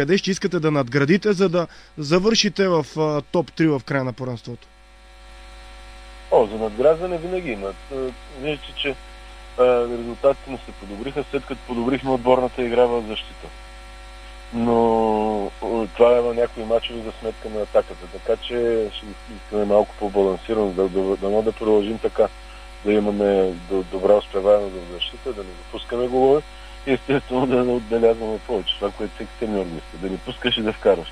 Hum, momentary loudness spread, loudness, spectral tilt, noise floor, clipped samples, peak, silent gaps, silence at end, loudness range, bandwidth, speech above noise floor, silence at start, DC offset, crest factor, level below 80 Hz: none; 16 LU; -21 LUFS; -5.5 dB/octave; -46 dBFS; under 0.1%; -2 dBFS; none; 0 s; 4 LU; 10.5 kHz; 25 dB; 0 s; under 0.1%; 20 dB; -42 dBFS